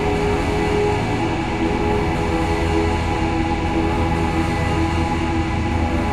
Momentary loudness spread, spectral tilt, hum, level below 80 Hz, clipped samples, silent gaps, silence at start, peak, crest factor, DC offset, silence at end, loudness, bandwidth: 2 LU; -6.5 dB/octave; none; -28 dBFS; under 0.1%; none; 0 s; -6 dBFS; 12 dB; 1%; 0 s; -20 LUFS; 12 kHz